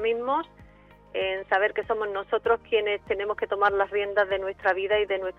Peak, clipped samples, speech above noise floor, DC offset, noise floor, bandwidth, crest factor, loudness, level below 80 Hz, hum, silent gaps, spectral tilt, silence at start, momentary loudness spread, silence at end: -10 dBFS; under 0.1%; 27 dB; under 0.1%; -53 dBFS; 6 kHz; 16 dB; -26 LUFS; -56 dBFS; none; none; -5.5 dB/octave; 0 s; 5 LU; 0.1 s